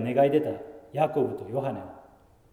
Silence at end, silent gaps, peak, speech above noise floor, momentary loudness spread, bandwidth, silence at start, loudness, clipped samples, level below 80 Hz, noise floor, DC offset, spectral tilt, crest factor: 0.5 s; none; -10 dBFS; 30 dB; 17 LU; 15.5 kHz; 0 s; -27 LUFS; under 0.1%; -64 dBFS; -56 dBFS; under 0.1%; -8.5 dB/octave; 18 dB